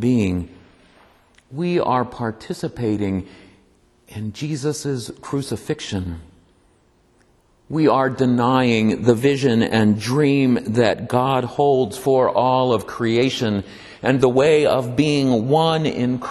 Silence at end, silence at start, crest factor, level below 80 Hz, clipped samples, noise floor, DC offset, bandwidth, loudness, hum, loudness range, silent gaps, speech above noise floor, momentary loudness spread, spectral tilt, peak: 0 s; 0 s; 18 dB; -50 dBFS; under 0.1%; -58 dBFS; under 0.1%; 12.5 kHz; -19 LUFS; none; 10 LU; none; 39 dB; 11 LU; -6.5 dB/octave; -2 dBFS